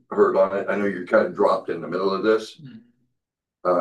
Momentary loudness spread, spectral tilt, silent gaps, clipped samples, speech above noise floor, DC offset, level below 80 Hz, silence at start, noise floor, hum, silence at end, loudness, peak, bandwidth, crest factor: 8 LU; -6.5 dB/octave; none; under 0.1%; 61 dB; under 0.1%; -70 dBFS; 0.1 s; -83 dBFS; none; 0 s; -22 LUFS; -6 dBFS; 10.5 kHz; 18 dB